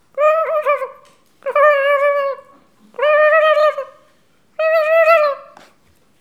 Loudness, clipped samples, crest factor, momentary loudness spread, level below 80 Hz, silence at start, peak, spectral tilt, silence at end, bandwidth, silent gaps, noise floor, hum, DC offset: -14 LUFS; under 0.1%; 16 dB; 19 LU; -74 dBFS; 0.15 s; 0 dBFS; -1.5 dB/octave; 0.75 s; 14 kHz; none; -57 dBFS; none; 0.1%